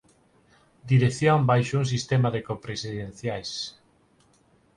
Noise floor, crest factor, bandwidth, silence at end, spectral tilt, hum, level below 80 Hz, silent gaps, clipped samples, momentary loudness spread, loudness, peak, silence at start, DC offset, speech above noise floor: -62 dBFS; 18 dB; 10.5 kHz; 1.05 s; -6 dB/octave; none; -56 dBFS; none; under 0.1%; 12 LU; -25 LUFS; -8 dBFS; 0.85 s; under 0.1%; 38 dB